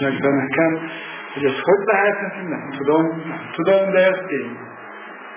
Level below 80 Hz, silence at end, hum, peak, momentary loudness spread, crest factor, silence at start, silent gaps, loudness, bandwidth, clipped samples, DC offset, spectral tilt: -66 dBFS; 0 s; none; -4 dBFS; 16 LU; 16 dB; 0 s; none; -19 LUFS; 3.6 kHz; under 0.1%; under 0.1%; -10 dB/octave